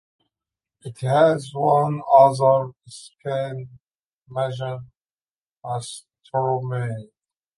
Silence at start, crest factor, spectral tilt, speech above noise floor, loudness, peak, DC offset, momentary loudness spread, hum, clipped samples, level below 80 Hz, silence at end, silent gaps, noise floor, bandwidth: 0.85 s; 20 dB; -6.5 dB/octave; over 69 dB; -21 LUFS; -2 dBFS; under 0.1%; 24 LU; none; under 0.1%; -68 dBFS; 0.5 s; 3.95-4.00 s, 4.07-4.22 s, 5.22-5.27 s; under -90 dBFS; 11.5 kHz